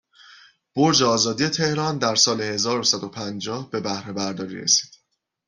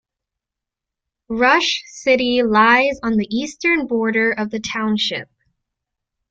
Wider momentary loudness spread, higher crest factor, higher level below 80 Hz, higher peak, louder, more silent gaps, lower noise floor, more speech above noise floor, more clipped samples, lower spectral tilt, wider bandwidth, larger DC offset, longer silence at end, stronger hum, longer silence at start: about the same, 12 LU vs 10 LU; about the same, 20 dB vs 18 dB; second, -62 dBFS vs -54 dBFS; about the same, -4 dBFS vs -2 dBFS; second, -21 LUFS vs -17 LUFS; neither; second, -72 dBFS vs -85 dBFS; second, 50 dB vs 68 dB; neither; about the same, -3 dB/octave vs -4 dB/octave; first, 12 kHz vs 7.8 kHz; neither; second, 0.6 s vs 1.05 s; neither; second, 0.3 s vs 1.3 s